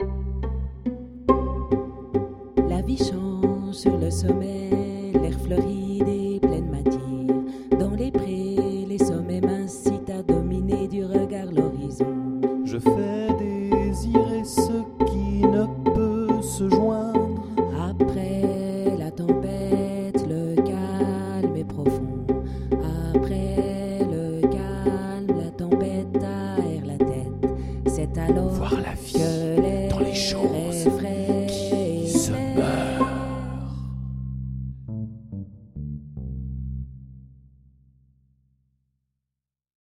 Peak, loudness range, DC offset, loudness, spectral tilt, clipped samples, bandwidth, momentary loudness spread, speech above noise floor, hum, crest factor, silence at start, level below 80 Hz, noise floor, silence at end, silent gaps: -2 dBFS; 8 LU; under 0.1%; -25 LUFS; -6.5 dB/octave; under 0.1%; 14.5 kHz; 10 LU; 65 dB; none; 22 dB; 0 s; -36 dBFS; -87 dBFS; 2.6 s; none